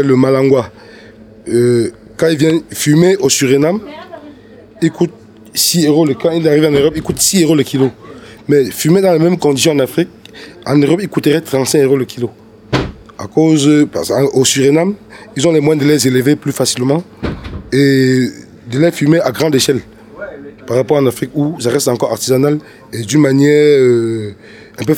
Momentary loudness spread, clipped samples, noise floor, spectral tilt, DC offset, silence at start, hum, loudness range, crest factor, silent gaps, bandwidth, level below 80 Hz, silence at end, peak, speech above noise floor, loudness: 14 LU; under 0.1%; -38 dBFS; -5 dB/octave; under 0.1%; 0 s; none; 3 LU; 12 dB; none; 18.5 kHz; -42 dBFS; 0 s; 0 dBFS; 26 dB; -12 LUFS